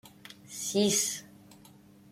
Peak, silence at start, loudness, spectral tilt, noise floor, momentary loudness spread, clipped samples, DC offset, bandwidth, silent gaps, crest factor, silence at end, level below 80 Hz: -14 dBFS; 0.05 s; -29 LUFS; -3 dB/octave; -56 dBFS; 23 LU; under 0.1%; under 0.1%; 16.5 kHz; none; 20 dB; 0.55 s; -72 dBFS